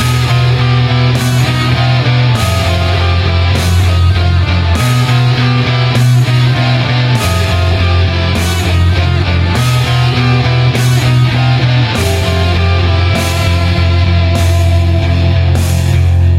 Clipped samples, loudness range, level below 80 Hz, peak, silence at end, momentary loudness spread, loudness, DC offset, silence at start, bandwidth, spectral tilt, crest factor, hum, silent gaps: under 0.1%; 1 LU; -22 dBFS; 0 dBFS; 0 s; 2 LU; -11 LUFS; under 0.1%; 0 s; 15 kHz; -5.5 dB/octave; 10 dB; none; none